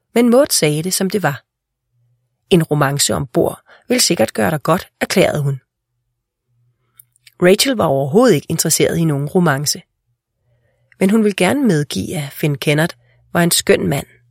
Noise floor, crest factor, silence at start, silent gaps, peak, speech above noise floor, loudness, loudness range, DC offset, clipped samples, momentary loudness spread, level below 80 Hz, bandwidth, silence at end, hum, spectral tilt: -73 dBFS; 16 dB; 0.15 s; none; 0 dBFS; 58 dB; -15 LUFS; 3 LU; under 0.1%; under 0.1%; 9 LU; -50 dBFS; 16.5 kHz; 0.25 s; none; -4.5 dB/octave